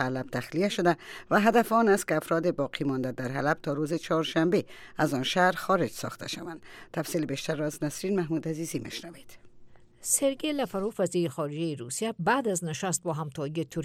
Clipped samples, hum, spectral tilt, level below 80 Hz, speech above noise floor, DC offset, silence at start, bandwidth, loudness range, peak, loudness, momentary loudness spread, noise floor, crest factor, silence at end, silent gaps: under 0.1%; none; -4.5 dB/octave; -62 dBFS; 22 dB; under 0.1%; 0 s; 17.5 kHz; 6 LU; -8 dBFS; -28 LUFS; 11 LU; -50 dBFS; 20 dB; 0 s; none